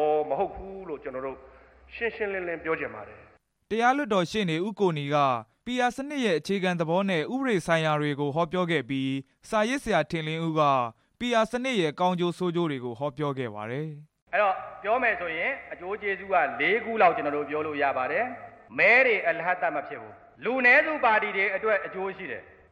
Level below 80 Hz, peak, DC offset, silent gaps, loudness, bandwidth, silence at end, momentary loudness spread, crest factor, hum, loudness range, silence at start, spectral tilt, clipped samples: -60 dBFS; -8 dBFS; under 0.1%; 14.22-14.26 s; -26 LUFS; 13.5 kHz; 0.25 s; 13 LU; 18 dB; none; 6 LU; 0 s; -5.5 dB/octave; under 0.1%